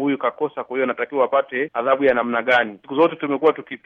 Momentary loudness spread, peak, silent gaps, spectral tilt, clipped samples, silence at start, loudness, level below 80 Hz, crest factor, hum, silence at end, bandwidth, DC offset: 6 LU; -4 dBFS; none; -6.5 dB/octave; under 0.1%; 0 s; -20 LUFS; -64 dBFS; 16 dB; none; 0.1 s; 6.4 kHz; under 0.1%